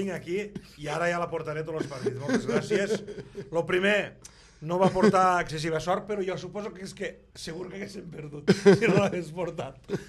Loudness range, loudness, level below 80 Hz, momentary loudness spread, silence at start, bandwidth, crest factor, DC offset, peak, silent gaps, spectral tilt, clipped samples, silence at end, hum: 4 LU; -27 LUFS; -56 dBFS; 17 LU; 0 s; 12.5 kHz; 22 dB; under 0.1%; -6 dBFS; none; -6 dB/octave; under 0.1%; 0 s; none